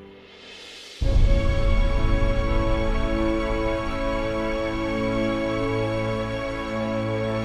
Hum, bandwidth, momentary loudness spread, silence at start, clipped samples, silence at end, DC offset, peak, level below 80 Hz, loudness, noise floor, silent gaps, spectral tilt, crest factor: none; 9.4 kHz; 7 LU; 0 s; under 0.1%; 0 s; under 0.1%; -8 dBFS; -26 dBFS; -25 LUFS; -45 dBFS; none; -7 dB/octave; 14 dB